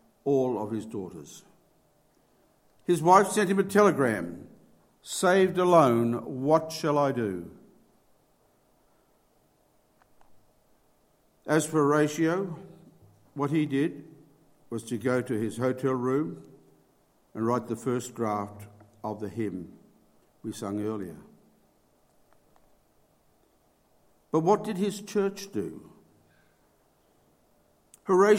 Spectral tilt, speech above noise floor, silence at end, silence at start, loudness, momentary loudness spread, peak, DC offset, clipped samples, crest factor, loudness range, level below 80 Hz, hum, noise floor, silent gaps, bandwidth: -6 dB/octave; 40 dB; 0 s; 0.25 s; -27 LUFS; 20 LU; -4 dBFS; under 0.1%; under 0.1%; 24 dB; 13 LU; -70 dBFS; none; -66 dBFS; none; 16.5 kHz